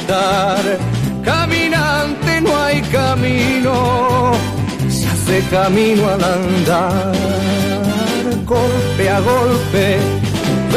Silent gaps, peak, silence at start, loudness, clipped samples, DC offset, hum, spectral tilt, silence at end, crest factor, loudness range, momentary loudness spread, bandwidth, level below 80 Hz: none; -4 dBFS; 0 s; -15 LUFS; under 0.1%; under 0.1%; none; -5.5 dB/octave; 0 s; 10 dB; 1 LU; 4 LU; 15.5 kHz; -34 dBFS